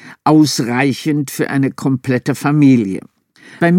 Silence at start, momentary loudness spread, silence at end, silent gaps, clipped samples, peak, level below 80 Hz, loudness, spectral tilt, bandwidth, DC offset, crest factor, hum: 0.05 s; 7 LU; 0 s; none; under 0.1%; 0 dBFS; -62 dBFS; -15 LUFS; -6 dB/octave; 17 kHz; under 0.1%; 14 dB; none